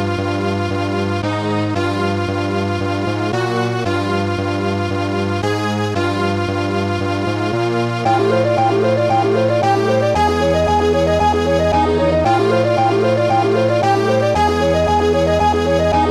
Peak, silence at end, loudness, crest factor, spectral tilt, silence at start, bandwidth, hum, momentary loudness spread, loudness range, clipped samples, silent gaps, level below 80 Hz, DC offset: -2 dBFS; 0 s; -16 LUFS; 12 dB; -6.5 dB/octave; 0 s; 13.5 kHz; none; 5 LU; 4 LU; under 0.1%; none; -36 dBFS; under 0.1%